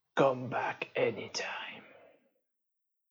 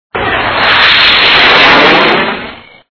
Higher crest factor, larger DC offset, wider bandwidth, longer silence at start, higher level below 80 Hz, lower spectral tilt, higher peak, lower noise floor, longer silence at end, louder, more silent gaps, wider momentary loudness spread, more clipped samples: first, 22 dB vs 8 dB; neither; first, 7.8 kHz vs 5.4 kHz; about the same, 0.15 s vs 0.15 s; second, -86 dBFS vs -36 dBFS; about the same, -4.5 dB/octave vs -4 dB/octave; second, -14 dBFS vs 0 dBFS; first, -84 dBFS vs -27 dBFS; first, 1.25 s vs 0.35 s; second, -34 LUFS vs -5 LUFS; neither; about the same, 13 LU vs 11 LU; second, under 0.1% vs 4%